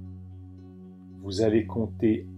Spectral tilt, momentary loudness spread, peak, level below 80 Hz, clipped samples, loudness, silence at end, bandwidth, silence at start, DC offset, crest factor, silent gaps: -7.5 dB/octave; 22 LU; -10 dBFS; -60 dBFS; under 0.1%; -27 LUFS; 0 s; 10 kHz; 0 s; under 0.1%; 18 dB; none